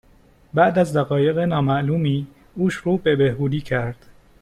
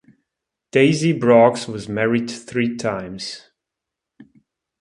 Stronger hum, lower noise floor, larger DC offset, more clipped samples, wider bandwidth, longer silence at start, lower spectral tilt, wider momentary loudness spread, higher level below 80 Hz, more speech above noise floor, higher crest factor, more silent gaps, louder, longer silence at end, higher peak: neither; second, -53 dBFS vs -84 dBFS; neither; neither; about the same, 12 kHz vs 11 kHz; second, 0.55 s vs 0.75 s; first, -7.5 dB/octave vs -6 dB/octave; second, 8 LU vs 16 LU; first, -50 dBFS vs -58 dBFS; second, 33 dB vs 66 dB; about the same, 18 dB vs 20 dB; neither; about the same, -20 LUFS vs -18 LUFS; second, 0.45 s vs 0.6 s; about the same, -2 dBFS vs 0 dBFS